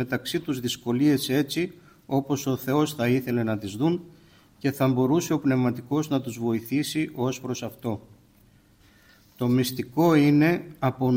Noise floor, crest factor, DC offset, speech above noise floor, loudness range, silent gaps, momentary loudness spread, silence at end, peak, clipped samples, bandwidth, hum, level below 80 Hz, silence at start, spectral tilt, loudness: -58 dBFS; 16 dB; under 0.1%; 33 dB; 5 LU; none; 9 LU; 0 s; -10 dBFS; under 0.1%; 16.5 kHz; none; -60 dBFS; 0 s; -6 dB/octave; -25 LUFS